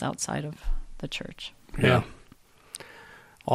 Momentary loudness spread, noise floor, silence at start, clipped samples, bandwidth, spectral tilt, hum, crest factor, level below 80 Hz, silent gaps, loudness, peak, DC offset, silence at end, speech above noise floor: 22 LU; -56 dBFS; 0 s; under 0.1%; 14 kHz; -5 dB/octave; none; 22 dB; -38 dBFS; none; -29 LUFS; -8 dBFS; under 0.1%; 0 s; 28 dB